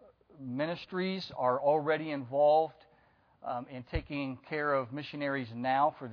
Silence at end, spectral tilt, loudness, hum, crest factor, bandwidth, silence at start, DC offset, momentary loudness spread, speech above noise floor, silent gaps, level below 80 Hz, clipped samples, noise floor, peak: 0 s; -8 dB/octave; -32 LUFS; none; 18 dB; 5.4 kHz; 0.4 s; under 0.1%; 12 LU; 34 dB; none; -54 dBFS; under 0.1%; -66 dBFS; -14 dBFS